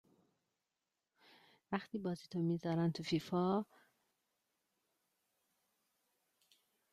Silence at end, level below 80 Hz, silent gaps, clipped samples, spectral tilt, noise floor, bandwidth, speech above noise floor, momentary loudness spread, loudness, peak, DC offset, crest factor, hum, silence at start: 3.3 s; -80 dBFS; none; under 0.1%; -7 dB/octave; under -90 dBFS; 13 kHz; over 52 dB; 7 LU; -39 LUFS; -22 dBFS; under 0.1%; 20 dB; none; 1.7 s